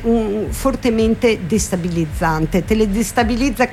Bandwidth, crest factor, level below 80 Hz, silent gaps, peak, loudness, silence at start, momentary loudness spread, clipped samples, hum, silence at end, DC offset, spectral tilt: 16 kHz; 14 dB; -28 dBFS; none; -2 dBFS; -17 LUFS; 0 s; 4 LU; under 0.1%; none; 0 s; under 0.1%; -5.5 dB/octave